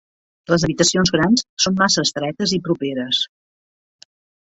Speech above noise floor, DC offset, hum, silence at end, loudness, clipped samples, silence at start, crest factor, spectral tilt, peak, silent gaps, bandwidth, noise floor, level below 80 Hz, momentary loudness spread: over 72 dB; under 0.1%; none; 1.15 s; -18 LUFS; under 0.1%; 0.5 s; 18 dB; -3.5 dB/octave; -2 dBFS; 1.49-1.57 s; 8.2 kHz; under -90 dBFS; -48 dBFS; 6 LU